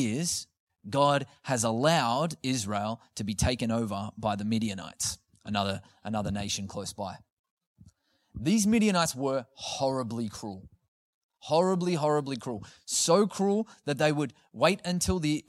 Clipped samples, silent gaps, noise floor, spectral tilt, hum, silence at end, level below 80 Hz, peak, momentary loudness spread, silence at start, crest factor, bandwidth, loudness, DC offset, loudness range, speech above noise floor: under 0.1%; 0.60-0.67 s, 7.32-7.44 s, 7.50-7.57 s, 7.67-7.76 s, 10.88-11.29 s; -63 dBFS; -4.5 dB/octave; none; 0.1 s; -52 dBFS; -8 dBFS; 13 LU; 0 s; 22 dB; 15 kHz; -29 LUFS; under 0.1%; 5 LU; 34 dB